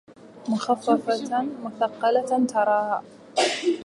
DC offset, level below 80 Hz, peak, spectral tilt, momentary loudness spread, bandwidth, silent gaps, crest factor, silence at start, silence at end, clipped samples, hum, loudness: under 0.1%; -76 dBFS; -6 dBFS; -4 dB/octave; 8 LU; 11.5 kHz; none; 18 dB; 0.1 s; 0 s; under 0.1%; none; -24 LUFS